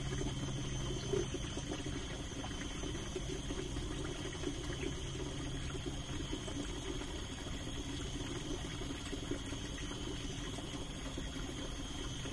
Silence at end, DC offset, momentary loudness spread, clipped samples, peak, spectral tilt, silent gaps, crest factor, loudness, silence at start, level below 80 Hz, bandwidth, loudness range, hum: 0 s; under 0.1%; 3 LU; under 0.1%; -24 dBFS; -4.5 dB/octave; none; 18 dB; -42 LUFS; 0 s; -46 dBFS; 11.5 kHz; 2 LU; none